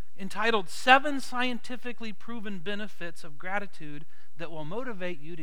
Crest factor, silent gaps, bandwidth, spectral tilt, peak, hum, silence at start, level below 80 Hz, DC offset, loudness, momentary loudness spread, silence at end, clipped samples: 28 dB; none; 19.5 kHz; -4 dB/octave; -2 dBFS; none; 0.2 s; -78 dBFS; 5%; -29 LUFS; 21 LU; 0 s; under 0.1%